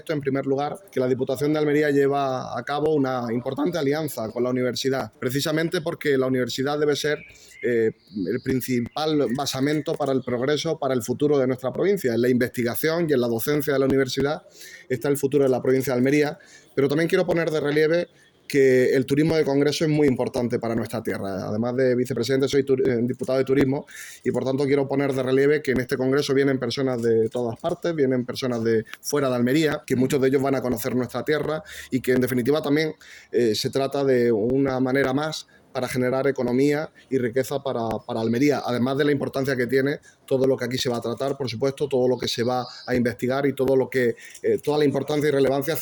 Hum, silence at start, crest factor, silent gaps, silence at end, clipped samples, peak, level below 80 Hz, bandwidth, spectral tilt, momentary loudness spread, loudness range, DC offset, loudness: none; 0.05 s; 14 dB; none; 0 s; under 0.1%; -8 dBFS; -58 dBFS; over 20 kHz; -5.5 dB/octave; 7 LU; 3 LU; under 0.1%; -23 LUFS